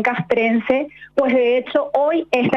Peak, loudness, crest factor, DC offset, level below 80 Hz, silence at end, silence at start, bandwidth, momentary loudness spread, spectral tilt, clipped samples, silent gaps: -6 dBFS; -18 LUFS; 12 dB; under 0.1%; -58 dBFS; 0 s; 0 s; 7.8 kHz; 4 LU; -7 dB/octave; under 0.1%; none